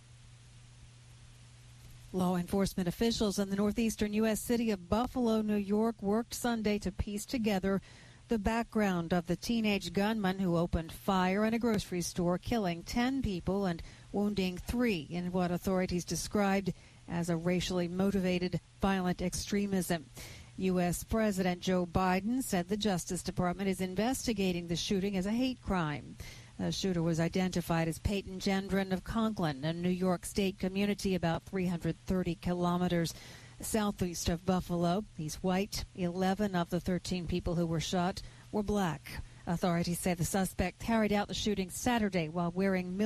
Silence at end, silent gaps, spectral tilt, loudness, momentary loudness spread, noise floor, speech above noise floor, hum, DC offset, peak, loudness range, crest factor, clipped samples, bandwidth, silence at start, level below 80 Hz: 0 s; none; -5.5 dB/octave; -33 LUFS; 6 LU; -55 dBFS; 23 dB; none; under 0.1%; -16 dBFS; 2 LU; 16 dB; under 0.1%; 15 kHz; 0.1 s; -50 dBFS